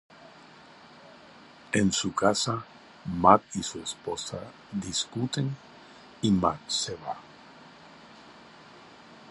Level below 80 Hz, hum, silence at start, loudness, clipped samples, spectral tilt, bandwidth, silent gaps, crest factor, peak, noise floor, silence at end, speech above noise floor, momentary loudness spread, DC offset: -56 dBFS; none; 0.2 s; -28 LUFS; under 0.1%; -4 dB/octave; 11.5 kHz; none; 28 dB; -4 dBFS; -52 dBFS; 0 s; 24 dB; 26 LU; under 0.1%